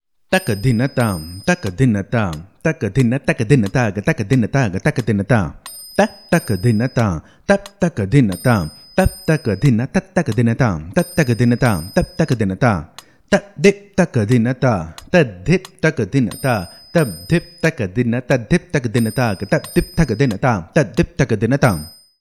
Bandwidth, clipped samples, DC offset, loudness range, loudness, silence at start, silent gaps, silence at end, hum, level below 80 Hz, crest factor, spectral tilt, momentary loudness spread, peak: 14 kHz; under 0.1%; 0.2%; 1 LU; -18 LUFS; 0.3 s; none; 0.3 s; none; -38 dBFS; 16 dB; -6.5 dB/octave; 5 LU; 0 dBFS